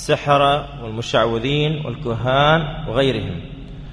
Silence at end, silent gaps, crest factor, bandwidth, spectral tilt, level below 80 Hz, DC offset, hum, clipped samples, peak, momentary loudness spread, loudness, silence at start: 0 s; none; 16 dB; 11 kHz; -6 dB/octave; -38 dBFS; under 0.1%; none; under 0.1%; -2 dBFS; 14 LU; -19 LUFS; 0 s